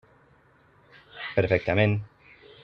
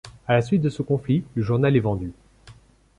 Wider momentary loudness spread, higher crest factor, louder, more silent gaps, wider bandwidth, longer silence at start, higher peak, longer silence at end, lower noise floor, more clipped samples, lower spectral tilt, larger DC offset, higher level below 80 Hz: first, 22 LU vs 7 LU; first, 22 dB vs 16 dB; about the same, -25 LUFS vs -23 LUFS; neither; second, 5.8 kHz vs 10.5 kHz; first, 1.15 s vs 0.05 s; about the same, -6 dBFS vs -8 dBFS; about the same, 0.55 s vs 0.45 s; first, -60 dBFS vs -50 dBFS; neither; about the same, -8.5 dB/octave vs -8.5 dB/octave; neither; second, -58 dBFS vs -48 dBFS